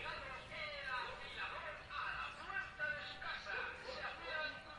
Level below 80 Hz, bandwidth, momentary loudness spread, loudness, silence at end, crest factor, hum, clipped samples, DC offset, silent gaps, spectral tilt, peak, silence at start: -64 dBFS; 11 kHz; 4 LU; -45 LUFS; 0 s; 16 dB; none; under 0.1%; under 0.1%; none; -3 dB/octave; -30 dBFS; 0 s